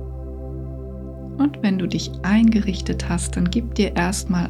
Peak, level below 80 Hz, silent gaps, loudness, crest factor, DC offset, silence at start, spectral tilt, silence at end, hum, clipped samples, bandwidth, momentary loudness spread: -6 dBFS; -32 dBFS; none; -21 LUFS; 16 dB; under 0.1%; 0 s; -5.5 dB/octave; 0 s; none; under 0.1%; 13 kHz; 16 LU